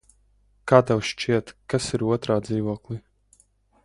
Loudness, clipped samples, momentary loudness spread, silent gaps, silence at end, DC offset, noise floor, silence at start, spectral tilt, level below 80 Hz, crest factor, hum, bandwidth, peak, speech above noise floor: -24 LUFS; under 0.1%; 16 LU; none; 0.85 s; under 0.1%; -62 dBFS; 0.65 s; -6 dB/octave; -54 dBFS; 24 dB; 50 Hz at -55 dBFS; 11.5 kHz; 0 dBFS; 39 dB